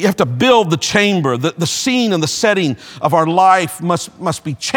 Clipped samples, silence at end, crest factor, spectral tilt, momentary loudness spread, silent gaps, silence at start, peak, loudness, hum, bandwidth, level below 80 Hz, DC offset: under 0.1%; 0 s; 14 dB; -4.5 dB/octave; 9 LU; none; 0 s; 0 dBFS; -14 LUFS; none; 19 kHz; -54 dBFS; under 0.1%